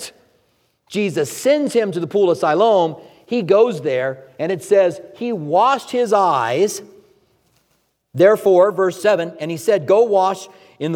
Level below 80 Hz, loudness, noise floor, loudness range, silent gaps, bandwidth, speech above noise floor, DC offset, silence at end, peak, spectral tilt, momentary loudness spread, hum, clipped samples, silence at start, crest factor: -72 dBFS; -17 LUFS; -65 dBFS; 2 LU; none; 17 kHz; 49 dB; under 0.1%; 0 s; -2 dBFS; -5 dB/octave; 12 LU; none; under 0.1%; 0 s; 16 dB